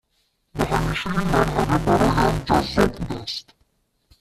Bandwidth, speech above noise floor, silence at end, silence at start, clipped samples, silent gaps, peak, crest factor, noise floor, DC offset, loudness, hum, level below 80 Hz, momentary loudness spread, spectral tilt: 14.5 kHz; 48 dB; 0.8 s; 0.55 s; under 0.1%; none; -2 dBFS; 20 dB; -69 dBFS; under 0.1%; -21 LUFS; none; -34 dBFS; 11 LU; -6 dB/octave